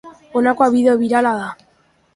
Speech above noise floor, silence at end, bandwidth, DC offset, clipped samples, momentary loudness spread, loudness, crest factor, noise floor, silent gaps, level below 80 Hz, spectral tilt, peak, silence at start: 43 dB; 0.6 s; 11.5 kHz; under 0.1%; under 0.1%; 10 LU; -16 LUFS; 16 dB; -58 dBFS; none; -58 dBFS; -6 dB/octave; 0 dBFS; 0.05 s